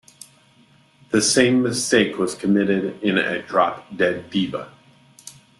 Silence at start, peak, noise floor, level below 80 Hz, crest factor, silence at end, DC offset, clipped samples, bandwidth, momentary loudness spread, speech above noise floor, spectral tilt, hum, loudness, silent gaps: 1.1 s; -2 dBFS; -55 dBFS; -60 dBFS; 20 dB; 0.3 s; under 0.1%; under 0.1%; 12.5 kHz; 8 LU; 35 dB; -4 dB/octave; none; -20 LUFS; none